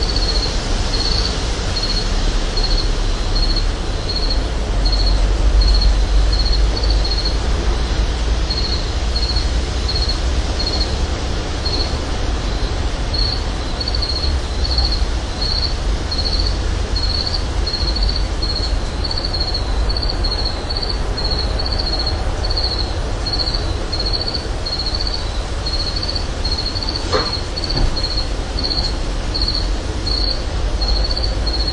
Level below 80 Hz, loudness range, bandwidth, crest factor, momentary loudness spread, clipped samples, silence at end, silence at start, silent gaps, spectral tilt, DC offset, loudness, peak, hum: -20 dBFS; 2 LU; 10.5 kHz; 14 dB; 4 LU; under 0.1%; 0 s; 0 s; none; -4.5 dB/octave; under 0.1%; -19 LUFS; -2 dBFS; none